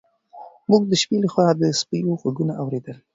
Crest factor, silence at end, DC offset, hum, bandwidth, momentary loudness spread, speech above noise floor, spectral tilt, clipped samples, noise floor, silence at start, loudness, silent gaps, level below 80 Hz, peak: 18 dB; 0.2 s; under 0.1%; none; 8 kHz; 10 LU; 23 dB; -5.5 dB/octave; under 0.1%; -44 dBFS; 0.35 s; -21 LUFS; none; -64 dBFS; -2 dBFS